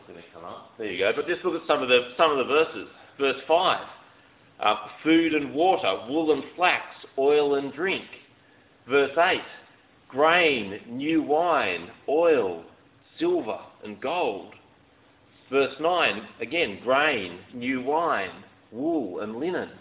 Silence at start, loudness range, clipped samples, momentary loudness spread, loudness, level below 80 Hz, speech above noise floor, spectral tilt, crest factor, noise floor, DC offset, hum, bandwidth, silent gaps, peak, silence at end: 0.1 s; 4 LU; under 0.1%; 15 LU; -24 LUFS; -64 dBFS; 33 dB; -8 dB/octave; 20 dB; -58 dBFS; under 0.1%; none; 4 kHz; none; -4 dBFS; 0.05 s